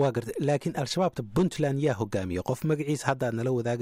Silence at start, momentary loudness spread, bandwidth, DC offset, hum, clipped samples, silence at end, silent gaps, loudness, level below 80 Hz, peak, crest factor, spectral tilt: 0 s; 3 LU; 16 kHz; under 0.1%; none; under 0.1%; 0 s; none; -28 LUFS; -56 dBFS; -10 dBFS; 18 dB; -6.5 dB/octave